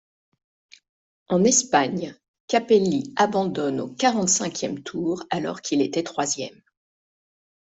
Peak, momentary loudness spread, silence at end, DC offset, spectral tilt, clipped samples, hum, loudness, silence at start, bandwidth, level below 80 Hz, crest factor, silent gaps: -4 dBFS; 10 LU; 1.15 s; under 0.1%; -3.5 dB/octave; under 0.1%; none; -23 LUFS; 1.3 s; 8.2 kHz; -66 dBFS; 20 dB; 2.28-2.34 s, 2.40-2.48 s